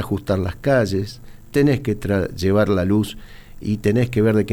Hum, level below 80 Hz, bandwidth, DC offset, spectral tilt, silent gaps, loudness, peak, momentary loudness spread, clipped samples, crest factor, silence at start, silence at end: none; -40 dBFS; 19 kHz; under 0.1%; -7.5 dB/octave; none; -20 LUFS; -6 dBFS; 9 LU; under 0.1%; 14 dB; 0 s; 0 s